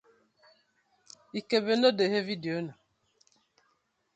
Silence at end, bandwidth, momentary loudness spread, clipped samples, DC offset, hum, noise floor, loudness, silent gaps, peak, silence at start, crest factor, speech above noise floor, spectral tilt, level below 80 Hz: 1.45 s; 8.6 kHz; 16 LU; under 0.1%; under 0.1%; none; -74 dBFS; -28 LUFS; none; -12 dBFS; 1.35 s; 22 dB; 47 dB; -5.5 dB/octave; -78 dBFS